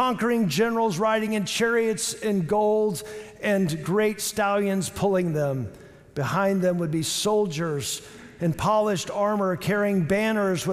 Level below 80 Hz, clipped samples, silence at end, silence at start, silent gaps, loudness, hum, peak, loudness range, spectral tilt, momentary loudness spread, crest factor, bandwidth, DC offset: -58 dBFS; under 0.1%; 0 s; 0 s; none; -24 LUFS; none; -12 dBFS; 2 LU; -5 dB/octave; 7 LU; 12 dB; 16 kHz; under 0.1%